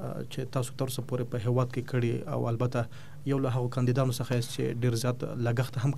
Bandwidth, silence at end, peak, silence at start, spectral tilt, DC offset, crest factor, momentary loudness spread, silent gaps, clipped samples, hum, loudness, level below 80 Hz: 14 kHz; 0 s; -12 dBFS; 0 s; -6.5 dB/octave; 0.8%; 16 dB; 5 LU; none; under 0.1%; none; -31 LUFS; -64 dBFS